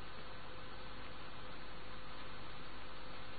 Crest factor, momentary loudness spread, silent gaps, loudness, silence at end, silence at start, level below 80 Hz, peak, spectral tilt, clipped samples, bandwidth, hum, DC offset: 14 dB; 1 LU; none; -51 LUFS; 0 s; 0 s; -60 dBFS; -32 dBFS; -2.5 dB/octave; under 0.1%; 4.6 kHz; none; 0.9%